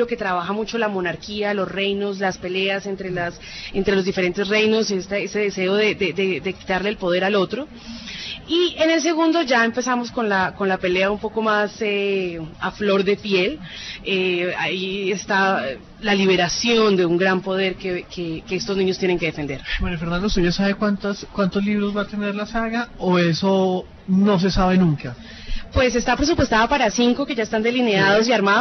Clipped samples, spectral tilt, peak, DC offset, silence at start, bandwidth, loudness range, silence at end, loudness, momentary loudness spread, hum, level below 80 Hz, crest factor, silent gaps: under 0.1%; -5 dB/octave; -6 dBFS; under 0.1%; 0 s; 6.4 kHz; 3 LU; 0 s; -20 LUFS; 10 LU; none; -38 dBFS; 16 dB; none